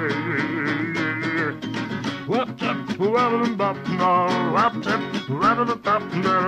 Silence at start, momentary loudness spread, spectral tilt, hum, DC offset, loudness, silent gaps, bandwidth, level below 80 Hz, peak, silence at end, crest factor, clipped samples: 0 s; 7 LU; -6 dB/octave; none; under 0.1%; -22 LUFS; none; 13 kHz; -58 dBFS; -8 dBFS; 0 s; 14 dB; under 0.1%